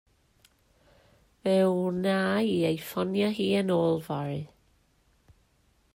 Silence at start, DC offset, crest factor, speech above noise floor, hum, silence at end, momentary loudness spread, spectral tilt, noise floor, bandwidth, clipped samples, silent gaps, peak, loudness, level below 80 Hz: 1.45 s; under 0.1%; 16 dB; 41 dB; none; 1.5 s; 9 LU; -6.5 dB/octave; -67 dBFS; 16 kHz; under 0.1%; none; -14 dBFS; -27 LUFS; -66 dBFS